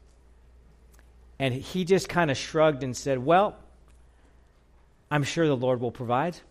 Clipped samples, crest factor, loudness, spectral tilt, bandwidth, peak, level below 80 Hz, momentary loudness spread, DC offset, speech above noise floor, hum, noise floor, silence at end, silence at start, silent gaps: under 0.1%; 20 dB; -26 LUFS; -5.5 dB/octave; 15 kHz; -8 dBFS; -54 dBFS; 7 LU; under 0.1%; 33 dB; none; -59 dBFS; 0.1 s; 1.4 s; none